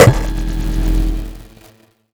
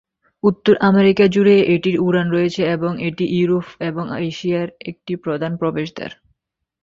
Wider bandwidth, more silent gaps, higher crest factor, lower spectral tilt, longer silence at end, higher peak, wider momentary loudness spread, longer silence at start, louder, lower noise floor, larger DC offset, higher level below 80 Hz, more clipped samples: first, over 20 kHz vs 7.6 kHz; neither; about the same, 16 dB vs 16 dB; second, -6 dB/octave vs -7.5 dB/octave; about the same, 0.7 s vs 0.7 s; about the same, 0 dBFS vs -2 dBFS; about the same, 15 LU vs 14 LU; second, 0 s vs 0.45 s; about the same, -18 LUFS vs -18 LUFS; second, -48 dBFS vs -70 dBFS; neither; first, -20 dBFS vs -56 dBFS; neither